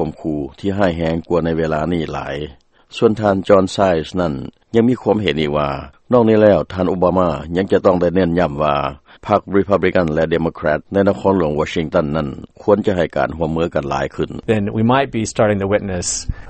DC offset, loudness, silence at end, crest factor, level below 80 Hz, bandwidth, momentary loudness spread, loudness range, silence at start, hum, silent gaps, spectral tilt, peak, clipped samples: under 0.1%; -17 LUFS; 0 s; 16 dB; -38 dBFS; 8.8 kHz; 9 LU; 3 LU; 0 s; none; none; -6 dB/octave; 0 dBFS; under 0.1%